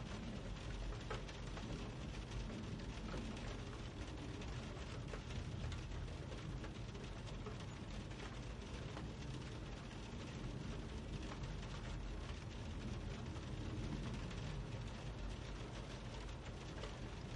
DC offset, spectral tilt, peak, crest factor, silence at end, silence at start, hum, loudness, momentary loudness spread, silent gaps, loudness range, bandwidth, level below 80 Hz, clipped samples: under 0.1%; -5.5 dB/octave; -32 dBFS; 16 dB; 0 s; 0 s; none; -49 LUFS; 3 LU; none; 2 LU; 11 kHz; -52 dBFS; under 0.1%